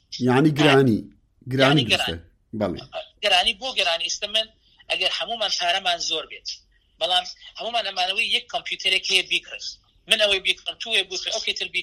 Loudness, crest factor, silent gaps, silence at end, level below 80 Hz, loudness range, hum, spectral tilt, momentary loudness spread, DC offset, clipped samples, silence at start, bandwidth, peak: -21 LUFS; 24 dB; none; 0 s; -56 dBFS; 3 LU; none; -3.5 dB/octave; 15 LU; under 0.1%; under 0.1%; 0.1 s; 16 kHz; 0 dBFS